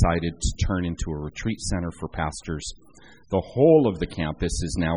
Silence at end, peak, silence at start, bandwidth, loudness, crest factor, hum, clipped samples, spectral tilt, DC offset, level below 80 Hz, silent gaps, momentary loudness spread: 0 s; -6 dBFS; 0 s; 10.5 kHz; -25 LUFS; 18 dB; none; under 0.1%; -6 dB/octave; 0.2%; -34 dBFS; none; 14 LU